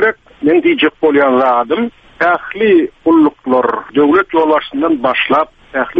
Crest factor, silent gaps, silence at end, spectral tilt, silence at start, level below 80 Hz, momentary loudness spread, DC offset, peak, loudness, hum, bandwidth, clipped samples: 12 dB; none; 0 s; -7 dB/octave; 0 s; -50 dBFS; 6 LU; under 0.1%; 0 dBFS; -12 LUFS; none; 5 kHz; under 0.1%